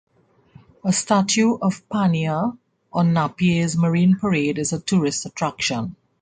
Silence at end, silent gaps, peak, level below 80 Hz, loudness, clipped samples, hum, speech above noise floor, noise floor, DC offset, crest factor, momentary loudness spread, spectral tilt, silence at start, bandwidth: 0.3 s; none; -4 dBFS; -56 dBFS; -21 LUFS; under 0.1%; none; 32 dB; -52 dBFS; under 0.1%; 16 dB; 8 LU; -5 dB/octave; 0.85 s; 9.4 kHz